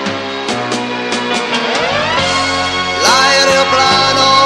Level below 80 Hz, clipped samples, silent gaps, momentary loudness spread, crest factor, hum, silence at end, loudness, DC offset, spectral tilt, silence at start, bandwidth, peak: -44 dBFS; under 0.1%; none; 9 LU; 12 dB; none; 0 s; -12 LUFS; under 0.1%; -2 dB/octave; 0 s; 13.5 kHz; 0 dBFS